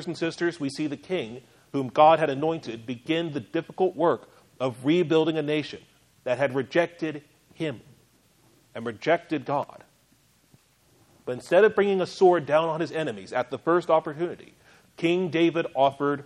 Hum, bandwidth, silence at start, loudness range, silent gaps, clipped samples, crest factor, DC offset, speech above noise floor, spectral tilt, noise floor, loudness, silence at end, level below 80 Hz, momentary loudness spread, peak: none; 11.5 kHz; 0 s; 8 LU; none; under 0.1%; 20 dB; under 0.1%; 38 dB; -6.5 dB/octave; -63 dBFS; -25 LUFS; 0.05 s; -70 dBFS; 16 LU; -6 dBFS